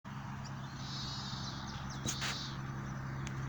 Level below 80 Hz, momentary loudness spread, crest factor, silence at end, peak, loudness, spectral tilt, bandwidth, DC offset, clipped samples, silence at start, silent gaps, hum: -54 dBFS; 7 LU; 20 dB; 0 s; -22 dBFS; -41 LUFS; -3.5 dB/octave; over 20 kHz; under 0.1%; under 0.1%; 0.05 s; none; none